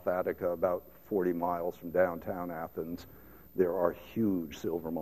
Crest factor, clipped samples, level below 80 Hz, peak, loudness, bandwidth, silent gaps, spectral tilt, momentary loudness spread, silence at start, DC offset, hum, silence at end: 20 dB; under 0.1%; -62 dBFS; -14 dBFS; -33 LUFS; 14.5 kHz; none; -7.5 dB/octave; 9 LU; 0 s; 0.1%; none; 0 s